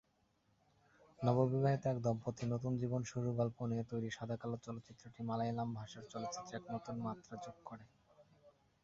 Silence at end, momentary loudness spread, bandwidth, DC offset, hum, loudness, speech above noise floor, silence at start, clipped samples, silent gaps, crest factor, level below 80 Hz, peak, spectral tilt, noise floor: 0.35 s; 16 LU; 7.6 kHz; under 0.1%; none; -40 LUFS; 38 dB; 1.2 s; under 0.1%; none; 22 dB; -72 dBFS; -20 dBFS; -7.5 dB/octave; -77 dBFS